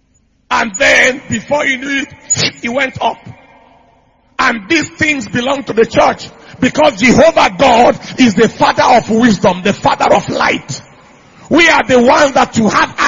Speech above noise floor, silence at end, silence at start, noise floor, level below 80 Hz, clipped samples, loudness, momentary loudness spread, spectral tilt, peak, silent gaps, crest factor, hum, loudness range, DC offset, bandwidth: 44 dB; 0 s; 0.5 s; -55 dBFS; -42 dBFS; 0.1%; -11 LUFS; 10 LU; -3.5 dB/octave; 0 dBFS; none; 12 dB; none; 6 LU; under 0.1%; 9.6 kHz